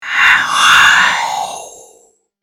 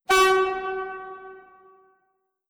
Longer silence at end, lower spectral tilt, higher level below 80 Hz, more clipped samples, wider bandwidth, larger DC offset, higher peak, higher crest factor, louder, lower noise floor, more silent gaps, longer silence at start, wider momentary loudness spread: second, 0.7 s vs 1.1 s; second, 1 dB/octave vs -1.5 dB/octave; about the same, -50 dBFS vs -54 dBFS; neither; about the same, over 20 kHz vs over 20 kHz; neither; first, 0 dBFS vs -10 dBFS; about the same, 12 dB vs 16 dB; first, -9 LUFS vs -22 LUFS; second, -51 dBFS vs -73 dBFS; neither; about the same, 0 s vs 0.1 s; second, 16 LU vs 24 LU